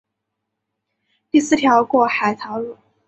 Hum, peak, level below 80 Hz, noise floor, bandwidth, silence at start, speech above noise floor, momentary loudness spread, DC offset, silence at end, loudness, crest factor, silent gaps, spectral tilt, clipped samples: none; -2 dBFS; -62 dBFS; -78 dBFS; 8.2 kHz; 1.35 s; 62 dB; 13 LU; under 0.1%; 0.35 s; -17 LUFS; 18 dB; none; -4 dB/octave; under 0.1%